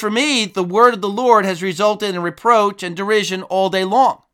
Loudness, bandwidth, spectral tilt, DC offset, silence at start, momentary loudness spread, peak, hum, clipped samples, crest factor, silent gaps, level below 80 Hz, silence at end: -16 LUFS; 16.5 kHz; -4 dB/octave; under 0.1%; 0 s; 7 LU; 0 dBFS; none; under 0.1%; 16 dB; none; -66 dBFS; 0.2 s